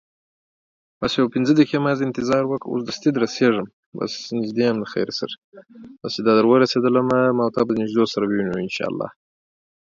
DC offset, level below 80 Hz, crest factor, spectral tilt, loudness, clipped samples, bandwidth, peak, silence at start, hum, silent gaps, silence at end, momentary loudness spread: under 0.1%; -60 dBFS; 18 dB; -6 dB/octave; -20 LUFS; under 0.1%; 7.6 kHz; -2 dBFS; 1 s; none; 3.73-3.92 s, 5.38-5.52 s; 0.9 s; 11 LU